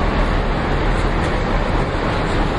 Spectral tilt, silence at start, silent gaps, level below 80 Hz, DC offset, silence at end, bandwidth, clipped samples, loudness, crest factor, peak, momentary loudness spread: -6.5 dB/octave; 0 s; none; -22 dBFS; under 0.1%; 0 s; 11 kHz; under 0.1%; -20 LUFS; 12 dB; -6 dBFS; 1 LU